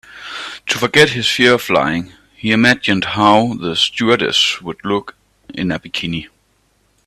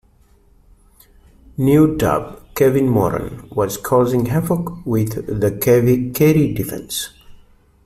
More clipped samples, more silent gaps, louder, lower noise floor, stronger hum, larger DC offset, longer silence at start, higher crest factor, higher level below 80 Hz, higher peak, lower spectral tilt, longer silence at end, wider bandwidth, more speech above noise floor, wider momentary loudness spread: neither; neither; about the same, -15 LUFS vs -17 LUFS; first, -59 dBFS vs -52 dBFS; neither; neither; second, 0.1 s vs 1.6 s; about the same, 16 dB vs 16 dB; second, -50 dBFS vs -42 dBFS; about the same, 0 dBFS vs -2 dBFS; second, -4 dB/octave vs -6.5 dB/octave; first, 0.8 s vs 0.5 s; about the same, 15.5 kHz vs 16 kHz; first, 44 dB vs 36 dB; first, 14 LU vs 11 LU